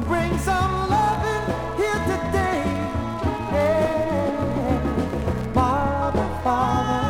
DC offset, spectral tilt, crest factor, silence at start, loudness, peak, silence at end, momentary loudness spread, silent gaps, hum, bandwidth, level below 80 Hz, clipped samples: under 0.1%; -6.5 dB/octave; 16 dB; 0 s; -23 LUFS; -6 dBFS; 0 s; 5 LU; none; none; 18.5 kHz; -36 dBFS; under 0.1%